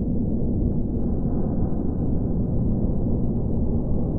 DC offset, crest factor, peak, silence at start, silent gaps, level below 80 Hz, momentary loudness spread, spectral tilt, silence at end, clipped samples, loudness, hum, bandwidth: under 0.1%; 12 dB; -10 dBFS; 0 s; none; -28 dBFS; 1 LU; -15.5 dB/octave; 0 s; under 0.1%; -25 LUFS; none; 1.6 kHz